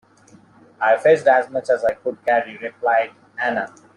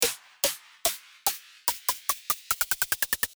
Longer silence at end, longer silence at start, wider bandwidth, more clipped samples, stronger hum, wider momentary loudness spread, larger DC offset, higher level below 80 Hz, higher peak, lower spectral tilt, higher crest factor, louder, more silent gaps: first, 0.3 s vs 0.1 s; first, 0.8 s vs 0 s; second, 11 kHz vs over 20 kHz; neither; neither; first, 10 LU vs 4 LU; neither; about the same, -64 dBFS vs -60 dBFS; first, -2 dBFS vs -6 dBFS; first, -5 dB/octave vs 1 dB/octave; second, 18 dB vs 24 dB; first, -19 LUFS vs -28 LUFS; neither